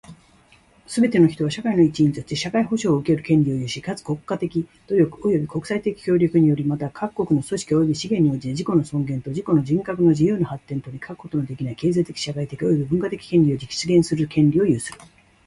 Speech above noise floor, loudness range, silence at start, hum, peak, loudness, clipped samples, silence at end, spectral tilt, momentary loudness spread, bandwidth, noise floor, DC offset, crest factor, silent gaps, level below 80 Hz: 34 dB; 3 LU; 0.1 s; none; -4 dBFS; -21 LUFS; under 0.1%; 0.5 s; -7 dB/octave; 10 LU; 11.5 kHz; -54 dBFS; under 0.1%; 16 dB; none; -52 dBFS